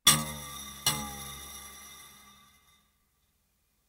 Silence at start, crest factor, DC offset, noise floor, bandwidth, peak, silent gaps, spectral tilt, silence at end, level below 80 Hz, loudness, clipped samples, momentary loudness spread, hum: 0.05 s; 28 dB; under 0.1%; -74 dBFS; 16 kHz; -6 dBFS; none; -1 dB/octave; 1.55 s; -58 dBFS; -31 LUFS; under 0.1%; 20 LU; none